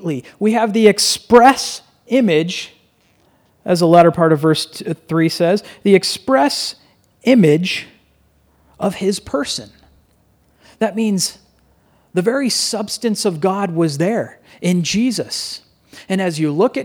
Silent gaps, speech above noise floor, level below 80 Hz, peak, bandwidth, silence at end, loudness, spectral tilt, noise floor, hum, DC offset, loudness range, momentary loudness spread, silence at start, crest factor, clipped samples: none; 41 dB; -56 dBFS; 0 dBFS; 19 kHz; 0 s; -16 LUFS; -4.5 dB/octave; -56 dBFS; none; under 0.1%; 7 LU; 13 LU; 0 s; 16 dB; under 0.1%